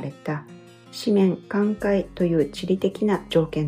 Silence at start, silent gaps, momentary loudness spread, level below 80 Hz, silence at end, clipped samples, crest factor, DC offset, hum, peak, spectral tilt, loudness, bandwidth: 0 s; none; 11 LU; -50 dBFS; 0 s; under 0.1%; 16 dB; under 0.1%; none; -8 dBFS; -7 dB/octave; -23 LUFS; 15.5 kHz